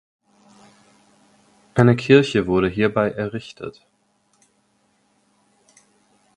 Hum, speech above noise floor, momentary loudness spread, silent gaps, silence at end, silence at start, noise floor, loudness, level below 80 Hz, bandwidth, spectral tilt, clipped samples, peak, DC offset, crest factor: none; 47 dB; 19 LU; none; 2.65 s; 1.75 s; -65 dBFS; -18 LUFS; -52 dBFS; 11 kHz; -7 dB/octave; under 0.1%; 0 dBFS; under 0.1%; 22 dB